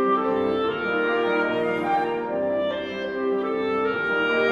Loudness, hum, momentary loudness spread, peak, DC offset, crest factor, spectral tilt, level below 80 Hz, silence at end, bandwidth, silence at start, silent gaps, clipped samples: -24 LUFS; none; 4 LU; -10 dBFS; under 0.1%; 14 dB; -6.5 dB/octave; -60 dBFS; 0 s; 7 kHz; 0 s; none; under 0.1%